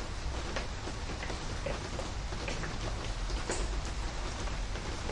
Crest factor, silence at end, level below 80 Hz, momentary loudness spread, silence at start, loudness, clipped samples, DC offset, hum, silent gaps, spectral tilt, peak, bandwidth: 16 dB; 0 s; -38 dBFS; 3 LU; 0 s; -38 LUFS; under 0.1%; under 0.1%; none; none; -4 dB/octave; -20 dBFS; 11 kHz